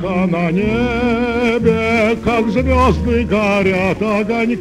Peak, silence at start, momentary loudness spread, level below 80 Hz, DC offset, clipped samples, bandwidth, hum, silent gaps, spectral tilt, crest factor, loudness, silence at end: -2 dBFS; 0 s; 3 LU; -28 dBFS; under 0.1%; under 0.1%; 12 kHz; none; none; -7 dB/octave; 12 dB; -15 LUFS; 0 s